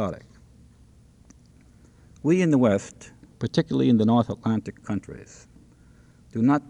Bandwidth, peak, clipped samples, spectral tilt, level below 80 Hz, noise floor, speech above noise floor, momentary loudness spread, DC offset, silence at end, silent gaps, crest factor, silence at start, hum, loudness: 10 kHz; -8 dBFS; under 0.1%; -7.5 dB/octave; -56 dBFS; -54 dBFS; 31 dB; 19 LU; under 0.1%; 0.1 s; none; 18 dB; 0 s; none; -24 LUFS